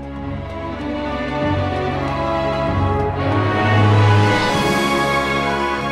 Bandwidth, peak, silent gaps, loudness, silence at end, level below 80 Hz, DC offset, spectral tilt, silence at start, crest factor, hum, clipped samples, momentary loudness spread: 13.5 kHz; -4 dBFS; none; -18 LUFS; 0 s; -34 dBFS; under 0.1%; -6 dB/octave; 0 s; 14 dB; none; under 0.1%; 12 LU